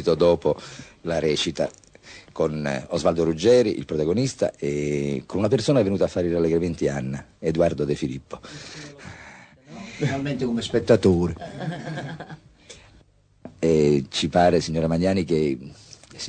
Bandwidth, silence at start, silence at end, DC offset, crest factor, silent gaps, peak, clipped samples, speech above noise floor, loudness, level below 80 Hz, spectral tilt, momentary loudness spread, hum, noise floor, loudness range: 9.4 kHz; 0 s; 0 s; under 0.1%; 20 dB; none; -4 dBFS; under 0.1%; 34 dB; -23 LUFS; -48 dBFS; -6 dB/octave; 20 LU; none; -56 dBFS; 5 LU